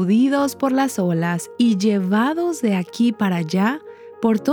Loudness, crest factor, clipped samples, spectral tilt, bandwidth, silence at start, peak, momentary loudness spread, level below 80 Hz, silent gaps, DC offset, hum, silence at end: -20 LUFS; 14 dB; under 0.1%; -6 dB/octave; 19.5 kHz; 0 s; -6 dBFS; 5 LU; -70 dBFS; none; under 0.1%; none; 0 s